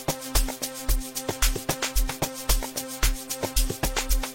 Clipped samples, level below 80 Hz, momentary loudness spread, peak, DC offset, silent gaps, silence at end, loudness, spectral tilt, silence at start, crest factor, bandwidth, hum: under 0.1%; -28 dBFS; 4 LU; -4 dBFS; under 0.1%; none; 0 s; -27 LUFS; -2.5 dB/octave; 0 s; 22 dB; 16.5 kHz; none